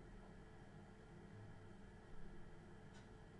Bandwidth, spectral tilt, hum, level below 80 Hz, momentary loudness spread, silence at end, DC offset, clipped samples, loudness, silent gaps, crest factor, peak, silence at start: 10.5 kHz; -6.5 dB/octave; none; -64 dBFS; 2 LU; 0 s; under 0.1%; under 0.1%; -61 LUFS; none; 14 dB; -42 dBFS; 0 s